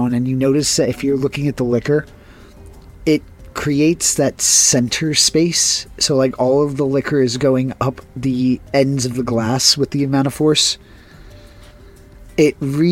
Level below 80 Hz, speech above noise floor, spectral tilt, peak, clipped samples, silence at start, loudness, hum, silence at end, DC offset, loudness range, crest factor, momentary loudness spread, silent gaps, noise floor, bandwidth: -44 dBFS; 25 dB; -4 dB/octave; 0 dBFS; under 0.1%; 0 s; -16 LUFS; none; 0 s; under 0.1%; 5 LU; 16 dB; 7 LU; none; -41 dBFS; 16.5 kHz